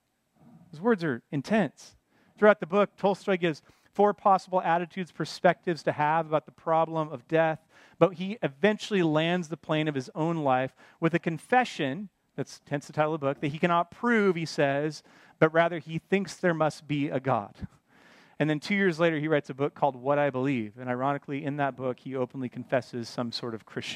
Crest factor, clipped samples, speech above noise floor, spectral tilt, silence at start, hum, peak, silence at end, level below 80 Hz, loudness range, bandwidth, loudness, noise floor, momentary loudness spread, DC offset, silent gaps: 22 dB; under 0.1%; 34 dB; -6.5 dB/octave; 0.75 s; none; -6 dBFS; 0 s; -68 dBFS; 3 LU; 12.5 kHz; -28 LUFS; -61 dBFS; 10 LU; under 0.1%; none